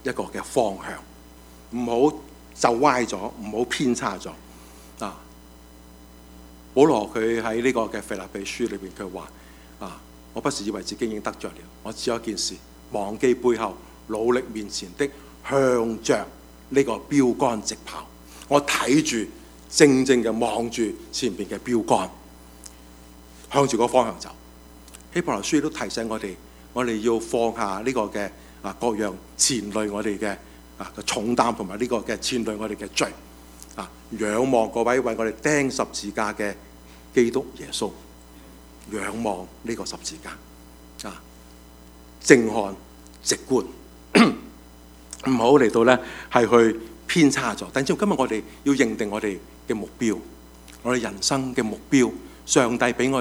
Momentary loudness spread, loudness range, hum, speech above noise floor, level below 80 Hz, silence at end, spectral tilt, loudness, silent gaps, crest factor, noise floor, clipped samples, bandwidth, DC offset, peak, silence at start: 19 LU; 9 LU; none; 24 dB; -50 dBFS; 0 s; -4 dB/octave; -23 LUFS; none; 24 dB; -47 dBFS; under 0.1%; over 20 kHz; under 0.1%; 0 dBFS; 0.05 s